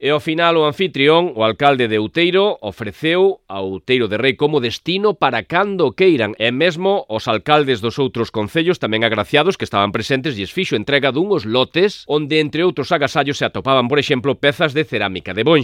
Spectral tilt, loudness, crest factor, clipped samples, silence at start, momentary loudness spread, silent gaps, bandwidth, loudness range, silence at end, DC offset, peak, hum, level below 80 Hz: -5.5 dB/octave; -16 LUFS; 16 dB; under 0.1%; 0 s; 6 LU; none; 14.5 kHz; 1 LU; 0 s; under 0.1%; 0 dBFS; none; -54 dBFS